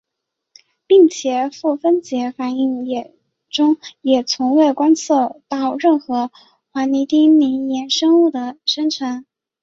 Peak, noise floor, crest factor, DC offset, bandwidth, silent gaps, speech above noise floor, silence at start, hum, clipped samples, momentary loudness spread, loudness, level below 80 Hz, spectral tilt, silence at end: -2 dBFS; -79 dBFS; 14 dB; under 0.1%; 7.8 kHz; none; 64 dB; 0.9 s; none; under 0.1%; 11 LU; -17 LUFS; -66 dBFS; -3 dB/octave; 0.4 s